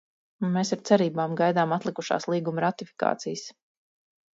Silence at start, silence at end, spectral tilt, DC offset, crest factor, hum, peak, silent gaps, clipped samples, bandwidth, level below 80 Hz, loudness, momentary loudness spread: 0.4 s; 0.85 s; -5.5 dB/octave; under 0.1%; 22 dB; none; -6 dBFS; none; under 0.1%; 7.8 kHz; -74 dBFS; -26 LUFS; 10 LU